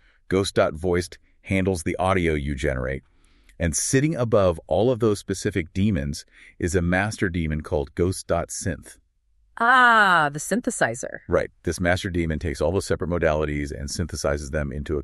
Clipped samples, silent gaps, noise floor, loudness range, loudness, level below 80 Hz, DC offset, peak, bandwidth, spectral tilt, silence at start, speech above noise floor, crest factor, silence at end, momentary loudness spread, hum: under 0.1%; none; -63 dBFS; 5 LU; -23 LUFS; -38 dBFS; under 0.1%; -4 dBFS; 13 kHz; -5 dB/octave; 0.3 s; 40 dB; 18 dB; 0 s; 9 LU; none